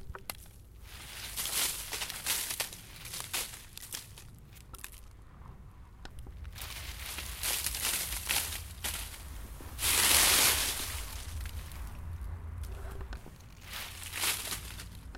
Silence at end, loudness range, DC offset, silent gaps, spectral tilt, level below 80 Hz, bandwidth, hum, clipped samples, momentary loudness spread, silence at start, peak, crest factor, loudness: 0 s; 15 LU; under 0.1%; none; -0.5 dB/octave; -46 dBFS; 17 kHz; none; under 0.1%; 24 LU; 0 s; -6 dBFS; 30 dB; -31 LUFS